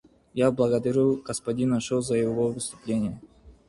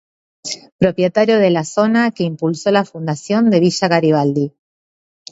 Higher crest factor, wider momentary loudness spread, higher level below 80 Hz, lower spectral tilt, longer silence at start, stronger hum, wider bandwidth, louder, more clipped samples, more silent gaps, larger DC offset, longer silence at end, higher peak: about the same, 16 dB vs 16 dB; about the same, 10 LU vs 12 LU; about the same, -56 dBFS vs -56 dBFS; about the same, -6 dB/octave vs -6 dB/octave; about the same, 0.35 s vs 0.45 s; neither; first, 11.5 kHz vs 8 kHz; second, -26 LUFS vs -15 LUFS; neither; second, none vs 0.72-0.79 s; neither; second, 0.15 s vs 0.8 s; second, -10 dBFS vs 0 dBFS